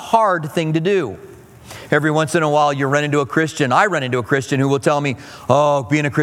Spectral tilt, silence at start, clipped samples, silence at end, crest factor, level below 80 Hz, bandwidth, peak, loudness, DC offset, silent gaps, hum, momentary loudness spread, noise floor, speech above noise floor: -5.5 dB/octave; 0 s; under 0.1%; 0 s; 16 dB; -56 dBFS; 16 kHz; 0 dBFS; -17 LUFS; under 0.1%; none; none; 7 LU; -38 dBFS; 22 dB